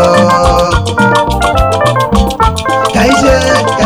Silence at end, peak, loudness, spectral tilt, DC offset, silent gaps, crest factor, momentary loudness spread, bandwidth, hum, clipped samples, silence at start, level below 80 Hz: 0 s; 0 dBFS; -9 LUFS; -5 dB/octave; under 0.1%; none; 8 dB; 4 LU; over 20 kHz; none; 1%; 0 s; -20 dBFS